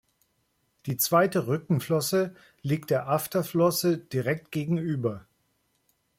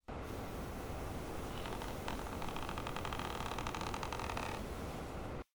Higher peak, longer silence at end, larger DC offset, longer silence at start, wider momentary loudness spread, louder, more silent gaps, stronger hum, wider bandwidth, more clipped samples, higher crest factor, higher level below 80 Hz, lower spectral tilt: first, -8 dBFS vs -24 dBFS; first, 1 s vs 0.1 s; neither; first, 0.85 s vs 0.05 s; first, 10 LU vs 4 LU; first, -27 LUFS vs -43 LUFS; neither; neither; second, 16.5 kHz vs over 20 kHz; neither; about the same, 18 dB vs 18 dB; second, -68 dBFS vs -50 dBFS; about the same, -5.5 dB/octave vs -5 dB/octave